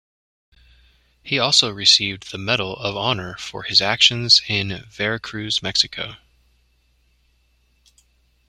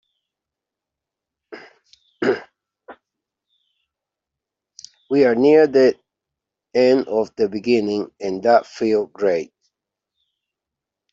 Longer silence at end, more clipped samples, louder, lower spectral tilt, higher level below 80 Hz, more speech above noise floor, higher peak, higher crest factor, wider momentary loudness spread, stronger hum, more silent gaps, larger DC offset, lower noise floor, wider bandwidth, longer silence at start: first, 2.3 s vs 1.65 s; neither; about the same, -18 LUFS vs -18 LUFS; second, -2 dB/octave vs -6 dB/octave; first, -54 dBFS vs -66 dBFS; second, 41 dB vs 69 dB; about the same, 0 dBFS vs -2 dBFS; about the same, 22 dB vs 18 dB; first, 15 LU vs 12 LU; neither; neither; neither; second, -62 dBFS vs -85 dBFS; first, 13.5 kHz vs 7.6 kHz; second, 1.25 s vs 1.5 s